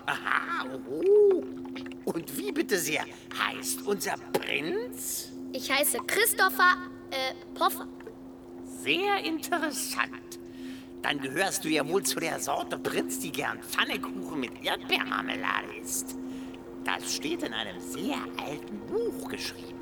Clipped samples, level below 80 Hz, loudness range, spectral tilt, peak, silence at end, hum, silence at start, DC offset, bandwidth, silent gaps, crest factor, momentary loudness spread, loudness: under 0.1%; -64 dBFS; 6 LU; -2 dB/octave; -8 dBFS; 0 s; none; 0 s; under 0.1%; over 20 kHz; none; 22 dB; 14 LU; -29 LUFS